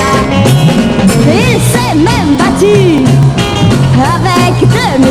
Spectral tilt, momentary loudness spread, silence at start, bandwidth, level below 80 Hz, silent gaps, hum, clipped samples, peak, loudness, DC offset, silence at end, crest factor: -6 dB/octave; 2 LU; 0 s; 14.5 kHz; -26 dBFS; none; none; 0.7%; 0 dBFS; -8 LUFS; under 0.1%; 0 s; 6 dB